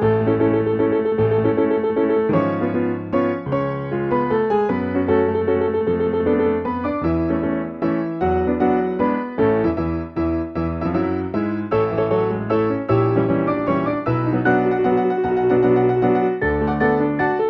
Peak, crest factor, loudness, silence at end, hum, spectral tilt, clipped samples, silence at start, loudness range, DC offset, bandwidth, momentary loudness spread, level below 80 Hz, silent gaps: -4 dBFS; 14 dB; -19 LUFS; 0 s; none; -10.5 dB/octave; under 0.1%; 0 s; 3 LU; under 0.1%; 5.6 kHz; 5 LU; -44 dBFS; none